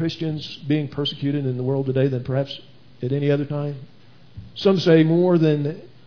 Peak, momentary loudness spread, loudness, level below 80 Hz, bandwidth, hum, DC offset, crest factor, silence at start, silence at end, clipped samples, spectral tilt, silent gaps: -4 dBFS; 15 LU; -21 LUFS; -58 dBFS; 5.4 kHz; none; 0.5%; 18 dB; 0 s; 0.2 s; under 0.1%; -8 dB/octave; none